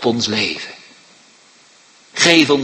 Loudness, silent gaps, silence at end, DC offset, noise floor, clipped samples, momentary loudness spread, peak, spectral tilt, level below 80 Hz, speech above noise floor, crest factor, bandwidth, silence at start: -14 LUFS; none; 0 s; under 0.1%; -49 dBFS; under 0.1%; 19 LU; 0 dBFS; -3 dB/octave; -58 dBFS; 34 dB; 18 dB; 16 kHz; 0 s